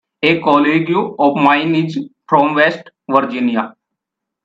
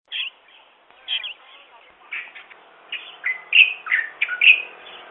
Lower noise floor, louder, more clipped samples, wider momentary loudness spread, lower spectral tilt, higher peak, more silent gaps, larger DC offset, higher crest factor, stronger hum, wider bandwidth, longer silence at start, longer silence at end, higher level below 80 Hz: first, -80 dBFS vs -52 dBFS; first, -14 LUFS vs -17 LUFS; neither; second, 10 LU vs 21 LU; first, -7 dB/octave vs -1.5 dB/octave; about the same, 0 dBFS vs 0 dBFS; neither; neither; second, 16 dB vs 22 dB; neither; first, 7.6 kHz vs 4.1 kHz; about the same, 0.2 s vs 0.1 s; first, 0.75 s vs 0.05 s; first, -62 dBFS vs -82 dBFS